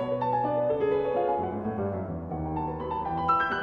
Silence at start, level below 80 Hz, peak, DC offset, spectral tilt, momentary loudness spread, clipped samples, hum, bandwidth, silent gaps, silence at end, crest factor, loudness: 0 s; -50 dBFS; -14 dBFS; under 0.1%; -9 dB/octave; 7 LU; under 0.1%; none; 6.4 kHz; none; 0 s; 14 dB; -28 LUFS